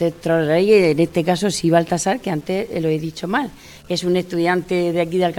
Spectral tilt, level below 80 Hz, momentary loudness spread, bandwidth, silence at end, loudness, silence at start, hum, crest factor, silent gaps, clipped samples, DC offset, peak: -5.5 dB/octave; -50 dBFS; 9 LU; 17.5 kHz; 0 s; -19 LUFS; 0 s; none; 18 dB; none; under 0.1%; under 0.1%; -2 dBFS